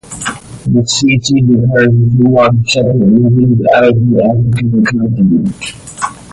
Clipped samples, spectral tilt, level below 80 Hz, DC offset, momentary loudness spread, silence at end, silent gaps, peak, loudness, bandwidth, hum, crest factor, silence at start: under 0.1%; -6 dB/octave; -38 dBFS; under 0.1%; 12 LU; 0.1 s; none; 0 dBFS; -10 LUFS; 11.5 kHz; none; 10 dB; 0.1 s